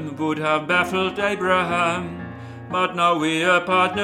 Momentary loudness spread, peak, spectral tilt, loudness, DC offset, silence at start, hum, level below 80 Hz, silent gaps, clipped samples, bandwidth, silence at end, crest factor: 12 LU; -4 dBFS; -4.5 dB/octave; -20 LUFS; under 0.1%; 0 s; none; -56 dBFS; none; under 0.1%; 15.5 kHz; 0 s; 16 dB